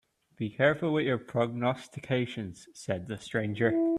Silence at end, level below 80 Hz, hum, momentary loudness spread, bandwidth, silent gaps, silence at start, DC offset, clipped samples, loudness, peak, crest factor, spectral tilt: 0 s; -66 dBFS; none; 12 LU; 11.5 kHz; none; 0.4 s; under 0.1%; under 0.1%; -30 LUFS; -12 dBFS; 18 dB; -6.5 dB/octave